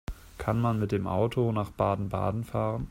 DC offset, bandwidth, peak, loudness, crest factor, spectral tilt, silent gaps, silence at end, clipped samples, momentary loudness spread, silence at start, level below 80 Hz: under 0.1%; 15.5 kHz; -10 dBFS; -29 LUFS; 18 dB; -8.5 dB/octave; none; 0 s; under 0.1%; 4 LU; 0.1 s; -46 dBFS